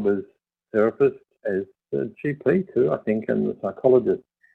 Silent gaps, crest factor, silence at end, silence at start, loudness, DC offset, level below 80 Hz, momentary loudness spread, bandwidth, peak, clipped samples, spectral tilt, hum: none; 18 dB; 0.4 s; 0 s; -24 LUFS; under 0.1%; -62 dBFS; 10 LU; 4.1 kHz; -4 dBFS; under 0.1%; -10 dB/octave; none